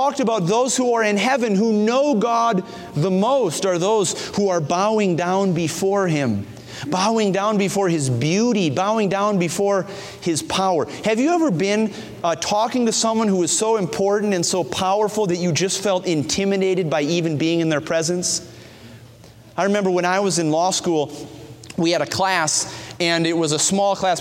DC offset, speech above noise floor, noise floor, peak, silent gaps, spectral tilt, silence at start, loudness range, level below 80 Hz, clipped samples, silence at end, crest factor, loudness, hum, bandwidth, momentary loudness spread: under 0.1%; 25 dB; -44 dBFS; -4 dBFS; none; -4 dB/octave; 0 s; 3 LU; -58 dBFS; under 0.1%; 0 s; 16 dB; -19 LUFS; none; 16 kHz; 6 LU